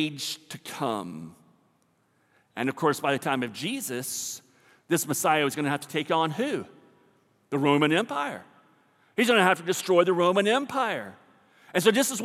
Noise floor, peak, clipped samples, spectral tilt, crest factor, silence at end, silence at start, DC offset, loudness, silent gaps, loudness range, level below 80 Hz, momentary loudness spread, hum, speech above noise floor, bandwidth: -68 dBFS; -6 dBFS; under 0.1%; -4 dB/octave; 22 dB; 0 s; 0 s; under 0.1%; -26 LUFS; none; 7 LU; -82 dBFS; 14 LU; none; 42 dB; 16.5 kHz